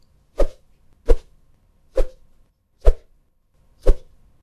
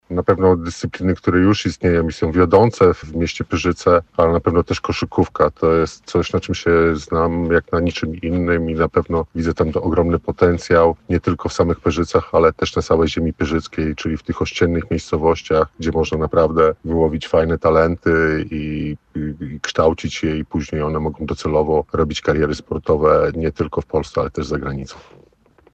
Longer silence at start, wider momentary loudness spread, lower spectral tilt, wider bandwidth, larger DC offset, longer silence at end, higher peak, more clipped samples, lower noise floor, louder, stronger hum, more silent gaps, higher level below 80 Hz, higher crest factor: first, 0.4 s vs 0.1 s; about the same, 11 LU vs 9 LU; about the same, -7.5 dB/octave vs -6.5 dB/octave; second, 6 kHz vs 8.4 kHz; neither; second, 0.45 s vs 0.75 s; about the same, 0 dBFS vs -2 dBFS; neither; first, -59 dBFS vs -53 dBFS; second, -26 LUFS vs -18 LUFS; neither; neither; first, -24 dBFS vs -34 dBFS; about the same, 20 dB vs 16 dB